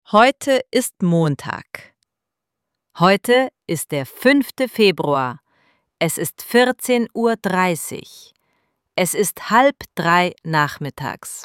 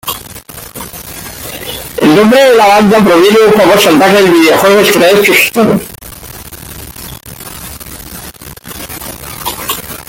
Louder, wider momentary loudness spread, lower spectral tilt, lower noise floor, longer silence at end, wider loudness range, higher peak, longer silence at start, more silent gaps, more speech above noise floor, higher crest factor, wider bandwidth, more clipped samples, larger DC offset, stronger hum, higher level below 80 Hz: second, -18 LUFS vs -6 LUFS; second, 12 LU vs 21 LU; about the same, -4.5 dB/octave vs -4 dB/octave; first, -83 dBFS vs -28 dBFS; about the same, 0 s vs 0.05 s; second, 2 LU vs 18 LU; about the same, 0 dBFS vs 0 dBFS; about the same, 0.1 s vs 0.05 s; neither; first, 64 dB vs 23 dB; first, 18 dB vs 10 dB; about the same, 17 kHz vs 17.5 kHz; neither; neither; neither; second, -62 dBFS vs -38 dBFS